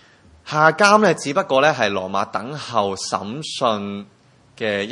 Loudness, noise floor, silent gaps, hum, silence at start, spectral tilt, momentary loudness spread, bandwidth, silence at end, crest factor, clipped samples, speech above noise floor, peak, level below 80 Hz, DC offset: -19 LUFS; -44 dBFS; none; none; 0.45 s; -4 dB/octave; 14 LU; 11.5 kHz; 0 s; 20 dB; under 0.1%; 25 dB; 0 dBFS; -64 dBFS; under 0.1%